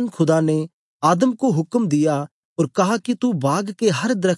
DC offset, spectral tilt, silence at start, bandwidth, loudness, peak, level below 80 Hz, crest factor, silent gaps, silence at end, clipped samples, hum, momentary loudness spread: under 0.1%; -6 dB/octave; 0 s; 11.5 kHz; -20 LUFS; -4 dBFS; -70 dBFS; 14 dB; 0.73-1.00 s, 2.31-2.56 s; 0 s; under 0.1%; none; 7 LU